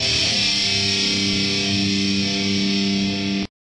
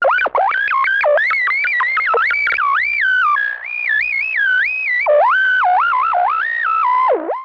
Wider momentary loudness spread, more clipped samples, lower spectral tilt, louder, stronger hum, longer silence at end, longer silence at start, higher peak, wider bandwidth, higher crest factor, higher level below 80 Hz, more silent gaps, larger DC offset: about the same, 5 LU vs 3 LU; neither; about the same, -3 dB/octave vs -3 dB/octave; second, -19 LUFS vs -14 LUFS; neither; first, 0.3 s vs 0 s; about the same, 0 s vs 0 s; about the same, -8 dBFS vs -6 dBFS; first, 11 kHz vs 7.2 kHz; about the same, 14 dB vs 10 dB; first, -48 dBFS vs -56 dBFS; neither; neither